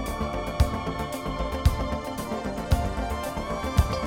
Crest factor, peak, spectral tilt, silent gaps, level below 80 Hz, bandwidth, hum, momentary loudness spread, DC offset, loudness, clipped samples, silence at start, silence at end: 20 dB; -8 dBFS; -6 dB/octave; none; -30 dBFS; 17 kHz; none; 5 LU; under 0.1%; -28 LUFS; under 0.1%; 0 s; 0 s